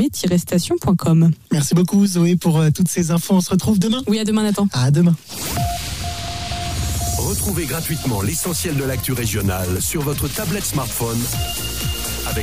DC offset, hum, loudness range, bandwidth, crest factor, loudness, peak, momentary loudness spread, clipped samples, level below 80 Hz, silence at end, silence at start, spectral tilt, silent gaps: 0.7%; none; 5 LU; 16 kHz; 12 dB; -19 LUFS; -6 dBFS; 7 LU; under 0.1%; -34 dBFS; 0 s; 0 s; -5 dB/octave; none